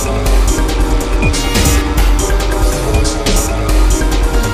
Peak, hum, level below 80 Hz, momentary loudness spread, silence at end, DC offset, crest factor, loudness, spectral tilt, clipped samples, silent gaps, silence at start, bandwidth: 0 dBFS; none; -12 dBFS; 3 LU; 0 s; under 0.1%; 12 dB; -14 LUFS; -4.5 dB/octave; under 0.1%; none; 0 s; 16 kHz